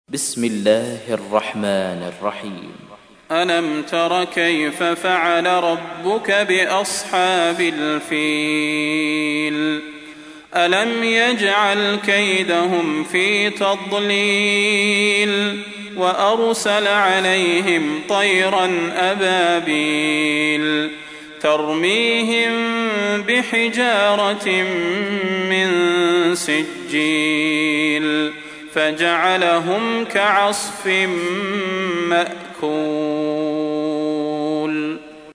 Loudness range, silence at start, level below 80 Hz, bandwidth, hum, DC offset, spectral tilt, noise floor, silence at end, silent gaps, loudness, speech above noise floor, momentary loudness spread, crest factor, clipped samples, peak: 4 LU; 0.1 s; -64 dBFS; 11 kHz; none; under 0.1%; -3.5 dB/octave; -38 dBFS; 0 s; none; -18 LUFS; 20 dB; 7 LU; 18 dB; under 0.1%; -2 dBFS